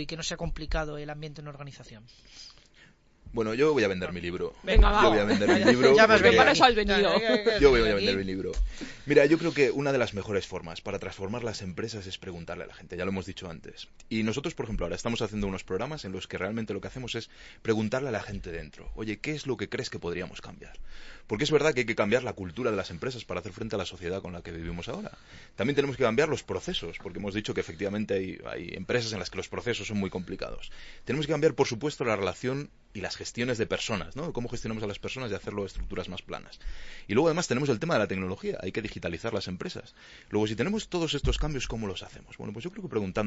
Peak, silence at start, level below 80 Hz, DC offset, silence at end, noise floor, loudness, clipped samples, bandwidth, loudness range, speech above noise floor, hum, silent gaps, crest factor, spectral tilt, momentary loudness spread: -4 dBFS; 0 s; -40 dBFS; under 0.1%; 0 s; -58 dBFS; -28 LUFS; under 0.1%; 8 kHz; 13 LU; 30 dB; none; none; 24 dB; -5 dB/octave; 18 LU